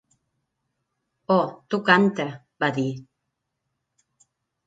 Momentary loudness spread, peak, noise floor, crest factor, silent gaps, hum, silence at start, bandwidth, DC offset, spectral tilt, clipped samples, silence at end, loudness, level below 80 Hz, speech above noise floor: 14 LU; -2 dBFS; -80 dBFS; 24 dB; none; none; 1.3 s; 7.8 kHz; under 0.1%; -6.5 dB/octave; under 0.1%; 1.65 s; -23 LUFS; -72 dBFS; 58 dB